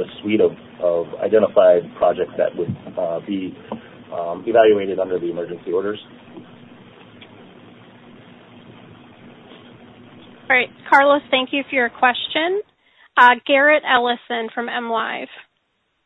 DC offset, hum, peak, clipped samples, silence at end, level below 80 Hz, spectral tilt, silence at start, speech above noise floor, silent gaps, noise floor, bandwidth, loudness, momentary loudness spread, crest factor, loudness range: under 0.1%; none; 0 dBFS; under 0.1%; 0.65 s; -64 dBFS; -6 dB/octave; 0 s; 51 dB; none; -69 dBFS; 7.8 kHz; -18 LUFS; 14 LU; 20 dB; 10 LU